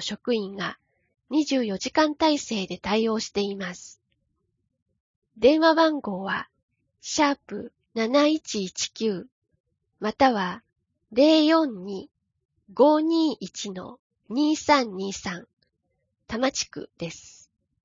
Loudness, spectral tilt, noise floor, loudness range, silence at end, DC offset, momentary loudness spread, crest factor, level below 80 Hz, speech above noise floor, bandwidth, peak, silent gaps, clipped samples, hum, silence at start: -24 LUFS; -4 dB/octave; -76 dBFS; 4 LU; 0.55 s; under 0.1%; 17 LU; 20 dB; -62 dBFS; 52 dB; 7.6 kHz; -6 dBFS; 4.82-4.86 s, 5.00-5.22 s, 6.63-6.68 s, 9.32-9.42 s, 9.60-9.64 s, 12.45-12.49 s, 13.99-14.10 s, 15.53-15.57 s; under 0.1%; none; 0 s